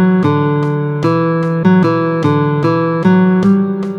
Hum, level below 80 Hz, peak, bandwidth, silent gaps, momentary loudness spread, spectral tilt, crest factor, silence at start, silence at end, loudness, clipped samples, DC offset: none; -54 dBFS; 0 dBFS; 6.6 kHz; none; 4 LU; -9 dB/octave; 12 dB; 0 s; 0 s; -13 LUFS; under 0.1%; under 0.1%